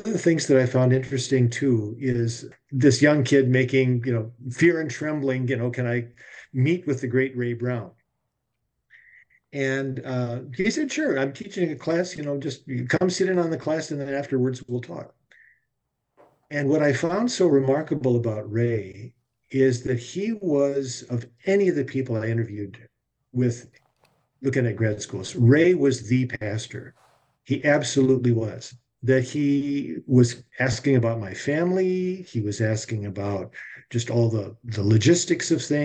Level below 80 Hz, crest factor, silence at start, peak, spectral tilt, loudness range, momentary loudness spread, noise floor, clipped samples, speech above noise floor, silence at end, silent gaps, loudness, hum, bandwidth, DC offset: -62 dBFS; 18 dB; 0 s; -6 dBFS; -6 dB/octave; 7 LU; 12 LU; -78 dBFS; under 0.1%; 56 dB; 0 s; none; -24 LUFS; none; 9 kHz; under 0.1%